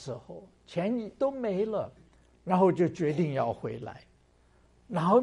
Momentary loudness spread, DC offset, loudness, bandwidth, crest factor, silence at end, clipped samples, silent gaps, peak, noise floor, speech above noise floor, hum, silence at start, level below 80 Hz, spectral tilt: 18 LU; under 0.1%; -30 LUFS; 11 kHz; 20 dB; 0 s; under 0.1%; none; -10 dBFS; -63 dBFS; 34 dB; none; 0 s; -64 dBFS; -8 dB/octave